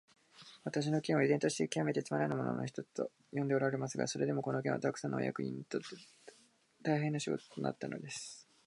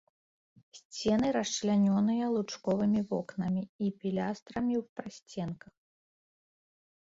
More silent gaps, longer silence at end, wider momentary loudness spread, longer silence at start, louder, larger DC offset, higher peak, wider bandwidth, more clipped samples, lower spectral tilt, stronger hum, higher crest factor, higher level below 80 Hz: second, none vs 0.85-0.90 s, 3.69-3.79 s, 4.42-4.46 s, 4.89-4.96 s, 5.22-5.26 s; second, 0.25 s vs 1.65 s; about the same, 11 LU vs 13 LU; second, 0.35 s vs 0.75 s; second, -37 LUFS vs -31 LUFS; neither; about the same, -18 dBFS vs -18 dBFS; first, 11.5 kHz vs 7.8 kHz; neither; about the same, -5.5 dB/octave vs -6 dB/octave; neither; about the same, 18 dB vs 16 dB; second, -82 dBFS vs -66 dBFS